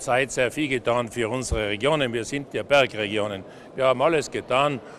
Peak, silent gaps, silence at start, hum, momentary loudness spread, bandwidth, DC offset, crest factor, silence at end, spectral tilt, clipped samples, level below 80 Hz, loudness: -6 dBFS; none; 0 s; none; 9 LU; 14 kHz; under 0.1%; 18 dB; 0 s; -4 dB/octave; under 0.1%; -44 dBFS; -24 LUFS